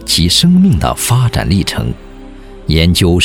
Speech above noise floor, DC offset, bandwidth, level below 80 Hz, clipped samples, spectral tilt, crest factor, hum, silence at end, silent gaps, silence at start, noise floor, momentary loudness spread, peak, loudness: 21 dB; under 0.1%; 17.5 kHz; -24 dBFS; under 0.1%; -5 dB/octave; 12 dB; none; 0 s; none; 0 s; -31 dBFS; 12 LU; 0 dBFS; -11 LUFS